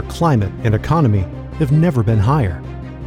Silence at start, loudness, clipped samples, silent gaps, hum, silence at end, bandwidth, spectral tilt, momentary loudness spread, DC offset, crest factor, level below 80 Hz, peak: 0 s; -16 LUFS; under 0.1%; none; none; 0 s; 13 kHz; -8.5 dB/octave; 9 LU; under 0.1%; 12 dB; -32 dBFS; -4 dBFS